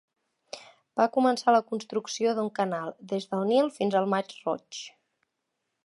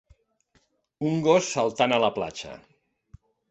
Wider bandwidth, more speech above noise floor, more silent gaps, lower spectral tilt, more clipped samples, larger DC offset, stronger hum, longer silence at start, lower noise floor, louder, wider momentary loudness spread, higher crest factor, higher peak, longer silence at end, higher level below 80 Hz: first, 11.5 kHz vs 8.4 kHz; first, 55 dB vs 44 dB; neither; about the same, -5 dB/octave vs -4.5 dB/octave; neither; neither; neither; second, 0.55 s vs 1 s; first, -82 dBFS vs -68 dBFS; second, -27 LUFS vs -24 LUFS; first, 18 LU vs 14 LU; about the same, 20 dB vs 20 dB; about the same, -8 dBFS vs -6 dBFS; about the same, 1 s vs 0.95 s; second, -78 dBFS vs -62 dBFS